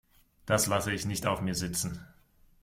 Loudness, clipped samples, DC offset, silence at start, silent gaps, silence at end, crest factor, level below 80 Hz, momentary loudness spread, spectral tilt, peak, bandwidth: -30 LUFS; under 0.1%; under 0.1%; 0.45 s; none; 0.55 s; 20 dB; -54 dBFS; 12 LU; -4 dB/octave; -12 dBFS; 16.5 kHz